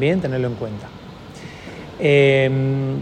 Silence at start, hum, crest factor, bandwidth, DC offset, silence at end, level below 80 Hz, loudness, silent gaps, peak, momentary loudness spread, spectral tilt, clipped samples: 0 s; none; 16 dB; 9 kHz; under 0.1%; 0 s; -50 dBFS; -18 LUFS; none; -2 dBFS; 23 LU; -7.5 dB/octave; under 0.1%